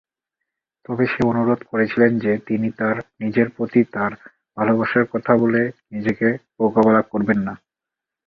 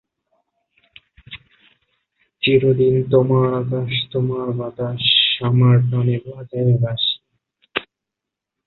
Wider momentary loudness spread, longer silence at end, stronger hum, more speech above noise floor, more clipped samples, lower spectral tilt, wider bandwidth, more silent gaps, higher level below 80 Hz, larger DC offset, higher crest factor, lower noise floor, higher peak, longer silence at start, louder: second, 9 LU vs 14 LU; second, 0.7 s vs 0.85 s; neither; about the same, 67 dB vs 67 dB; neither; second, -9 dB/octave vs -10.5 dB/octave; first, 5.8 kHz vs 4.3 kHz; neither; about the same, -56 dBFS vs -54 dBFS; neither; about the same, 20 dB vs 18 dB; about the same, -86 dBFS vs -84 dBFS; about the same, 0 dBFS vs -2 dBFS; second, 0.9 s vs 1.3 s; about the same, -20 LUFS vs -18 LUFS